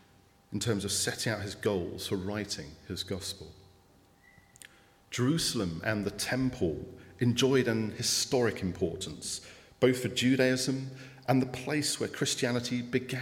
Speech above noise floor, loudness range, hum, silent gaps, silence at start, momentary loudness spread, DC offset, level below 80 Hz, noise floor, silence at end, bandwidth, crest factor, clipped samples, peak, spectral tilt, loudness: 31 dB; 7 LU; none; none; 0.5 s; 12 LU; under 0.1%; -62 dBFS; -62 dBFS; 0 s; 16.5 kHz; 22 dB; under 0.1%; -10 dBFS; -4 dB/octave; -31 LUFS